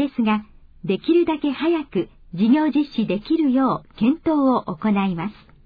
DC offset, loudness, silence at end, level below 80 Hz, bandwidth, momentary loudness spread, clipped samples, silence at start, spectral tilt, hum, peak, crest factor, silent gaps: under 0.1%; -21 LUFS; 0.35 s; -52 dBFS; 5 kHz; 9 LU; under 0.1%; 0 s; -9.5 dB/octave; none; -8 dBFS; 14 dB; none